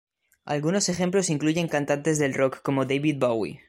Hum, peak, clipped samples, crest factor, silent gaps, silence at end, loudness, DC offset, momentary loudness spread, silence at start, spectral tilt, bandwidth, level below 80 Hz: none; -8 dBFS; under 0.1%; 16 dB; none; 0.1 s; -25 LUFS; under 0.1%; 2 LU; 0.45 s; -5 dB/octave; 15.5 kHz; -62 dBFS